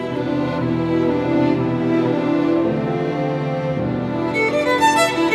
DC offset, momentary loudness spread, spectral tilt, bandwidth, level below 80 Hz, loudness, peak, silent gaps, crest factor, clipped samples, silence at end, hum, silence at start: under 0.1%; 6 LU; -6 dB/octave; 13 kHz; -48 dBFS; -19 LUFS; -4 dBFS; none; 14 dB; under 0.1%; 0 s; none; 0 s